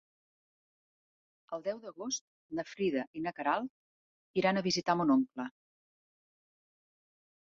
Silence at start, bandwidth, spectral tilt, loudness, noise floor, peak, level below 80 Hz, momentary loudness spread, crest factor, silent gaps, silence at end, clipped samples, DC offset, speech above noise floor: 1.5 s; 7.6 kHz; -4 dB/octave; -34 LUFS; under -90 dBFS; -14 dBFS; -76 dBFS; 13 LU; 22 dB; 2.21-2.49 s, 3.07-3.14 s, 3.70-4.34 s; 2.1 s; under 0.1%; under 0.1%; over 57 dB